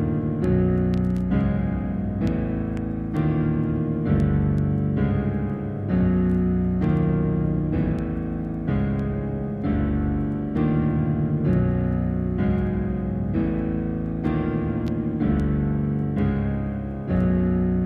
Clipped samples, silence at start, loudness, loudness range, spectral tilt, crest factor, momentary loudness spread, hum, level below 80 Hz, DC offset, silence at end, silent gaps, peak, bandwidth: under 0.1%; 0 s; -24 LUFS; 2 LU; -11 dB/octave; 14 dB; 5 LU; none; -34 dBFS; under 0.1%; 0 s; none; -10 dBFS; 4.9 kHz